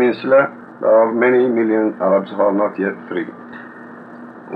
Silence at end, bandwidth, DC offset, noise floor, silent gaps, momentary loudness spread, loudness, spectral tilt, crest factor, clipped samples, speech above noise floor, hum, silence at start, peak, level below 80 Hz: 0 s; 4.9 kHz; under 0.1%; -36 dBFS; none; 22 LU; -16 LUFS; -9 dB/octave; 14 dB; under 0.1%; 20 dB; 60 Hz at -50 dBFS; 0 s; -2 dBFS; -74 dBFS